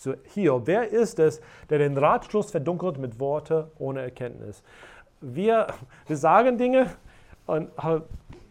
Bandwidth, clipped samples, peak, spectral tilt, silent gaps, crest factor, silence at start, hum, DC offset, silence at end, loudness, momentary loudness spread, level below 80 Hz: 11 kHz; under 0.1%; -4 dBFS; -7 dB/octave; none; 20 dB; 0 s; none; under 0.1%; 0.15 s; -25 LUFS; 16 LU; -54 dBFS